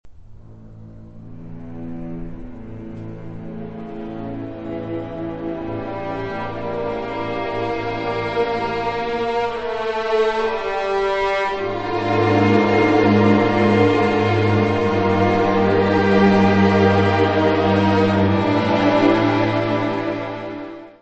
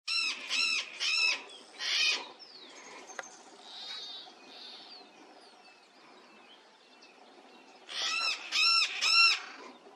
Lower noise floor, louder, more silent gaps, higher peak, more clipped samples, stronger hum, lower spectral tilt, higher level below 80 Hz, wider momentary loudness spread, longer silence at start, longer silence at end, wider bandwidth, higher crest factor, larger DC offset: second, -40 dBFS vs -58 dBFS; first, -18 LUFS vs -28 LUFS; neither; first, -2 dBFS vs -14 dBFS; neither; neither; first, -7.5 dB/octave vs 3 dB/octave; first, -44 dBFS vs under -90 dBFS; second, 18 LU vs 24 LU; about the same, 0.05 s vs 0.05 s; about the same, 0.1 s vs 0.05 s; second, 8.2 kHz vs 15.5 kHz; second, 16 dB vs 22 dB; first, 0.2% vs under 0.1%